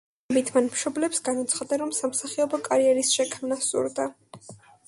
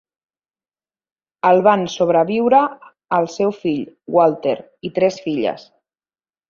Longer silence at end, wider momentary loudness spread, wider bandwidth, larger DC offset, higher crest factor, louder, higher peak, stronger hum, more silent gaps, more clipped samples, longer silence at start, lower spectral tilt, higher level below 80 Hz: second, 0.3 s vs 0.9 s; second, 6 LU vs 10 LU; first, 11.5 kHz vs 7.4 kHz; neither; about the same, 18 dB vs 18 dB; second, -25 LUFS vs -18 LUFS; second, -8 dBFS vs -2 dBFS; neither; neither; neither; second, 0.3 s vs 1.45 s; second, -2 dB/octave vs -6 dB/octave; second, -72 dBFS vs -64 dBFS